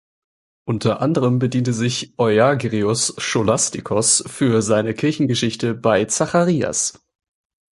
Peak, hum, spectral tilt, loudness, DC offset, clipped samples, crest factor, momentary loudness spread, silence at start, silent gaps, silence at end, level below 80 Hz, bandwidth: -2 dBFS; none; -4.5 dB/octave; -18 LUFS; under 0.1%; under 0.1%; 18 dB; 6 LU; 0.65 s; none; 0.85 s; -52 dBFS; 11.5 kHz